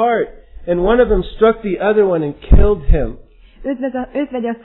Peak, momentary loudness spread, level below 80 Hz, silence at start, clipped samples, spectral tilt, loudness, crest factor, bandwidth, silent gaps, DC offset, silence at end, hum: 0 dBFS; 12 LU; -20 dBFS; 0 s; under 0.1%; -11.5 dB/octave; -16 LUFS; 14 dB; 4.1 kHz; none; under 0.1%; 0.05 s; none